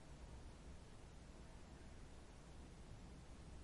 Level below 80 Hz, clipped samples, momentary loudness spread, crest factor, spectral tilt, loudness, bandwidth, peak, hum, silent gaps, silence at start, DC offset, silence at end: -60 dBFS; under 0.1%; 2 LU; 12 dB; -5.5 dB/octave; -61 LUFS; 11.5 kHz; -44 dBFS; none; none; 0 s; under 0.1%; 0 s